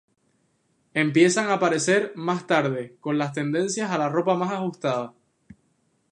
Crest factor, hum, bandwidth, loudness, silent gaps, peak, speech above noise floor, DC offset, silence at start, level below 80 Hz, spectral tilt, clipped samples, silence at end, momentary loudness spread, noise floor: 18 dB; none; 11 kHz; -24 LUFS; none; -6 dBFS; 45 dB; under 0.1%; 0.95 s; -72 dBFS; -5 dB/octave; under 0.1%; 1 s; 9 LU; -68 dBFS